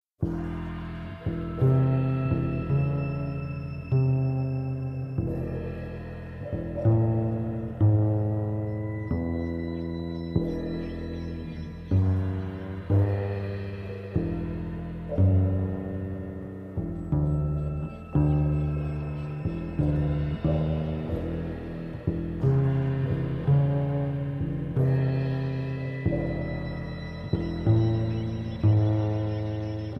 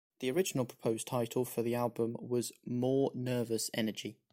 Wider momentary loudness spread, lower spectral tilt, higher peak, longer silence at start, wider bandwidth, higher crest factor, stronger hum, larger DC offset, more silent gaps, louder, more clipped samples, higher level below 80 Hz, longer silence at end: first, 11 LU vs 4 LU; first, -10.5 dB/octave vs -5 dB/octave; first, -10 dBFS vs -18 dBFS; about the same, 0.2 s vs 0.2 s; second, 5.8 kHz vs 16.5 kHz; about the same, 18 dB vs 16 dB; neither; neither; neither; first, -28 LUFS vs -35 LUFS; neither; first, -40 dBFS vs -72 dBFS; second, 0 s vs 0.2 s